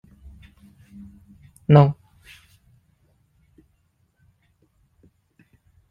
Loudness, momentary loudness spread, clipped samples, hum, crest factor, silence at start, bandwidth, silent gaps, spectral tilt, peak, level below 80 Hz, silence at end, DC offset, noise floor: -17 LUFS; 30 LU; under 0.1%; none; 24 dB; 1.7 s; 5 kHz; none; -9.5 dB/octave; -2 dBFS; -54 dBFS; 3.95 s; under 0.1%; -66 dBFS